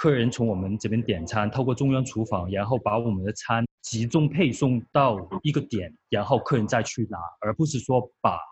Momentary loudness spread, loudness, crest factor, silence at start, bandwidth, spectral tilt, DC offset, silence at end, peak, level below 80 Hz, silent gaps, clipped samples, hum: 7 LU; -25 LUFS; 18 dB; 0 s; 8.6 kHz; -6 dB/octave; under 0.1%; 0 s; -6 dBFS; -54 dBFS; 3.71-3.78 s; under 0.1%; none